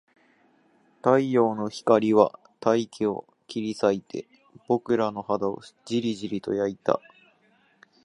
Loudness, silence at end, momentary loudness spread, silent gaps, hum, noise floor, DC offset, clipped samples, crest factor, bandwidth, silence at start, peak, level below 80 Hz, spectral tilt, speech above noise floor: -25 LUFS; 1.05 s; 11 LU; none; none; -63 dBFS; under 0.1%; under 0.1%; 22 dB; 11.5 kHz; 1.05 s; -4 dBFS; -68 dBFS; -6.5 dB/octave; 39 dB